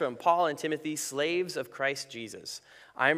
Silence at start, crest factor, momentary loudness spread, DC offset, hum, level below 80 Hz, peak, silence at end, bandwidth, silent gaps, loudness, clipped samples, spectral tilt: 0 s; 22 dB; 15 LU; under 0.1%; none; -78 dBFS; -10 dBFS; 0 s; 16 kHz; none; -31 LUFS; under 0.1%; -3 dB/octave